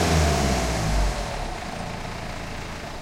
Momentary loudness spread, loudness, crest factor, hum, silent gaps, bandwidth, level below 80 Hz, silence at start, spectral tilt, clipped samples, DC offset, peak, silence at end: 12 LU; -26 LUFS; 16 dB; none; none; 16.5 kHz; -30 dBFS; 0 s; -4.5 dB/octave; under 0.1%; under 0.1%; -8 dBFS; 0 s